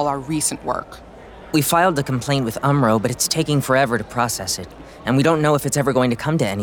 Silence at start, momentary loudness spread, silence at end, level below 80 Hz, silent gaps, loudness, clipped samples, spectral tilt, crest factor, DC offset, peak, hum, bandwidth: 0 s; 9 LU; 0 s; -46 dBFS; none; -19 LUFS; under 0.1%; -4.5 dB/octave; 16 dB; under 0.1%; -4 dBFS; none; 19.5 kHz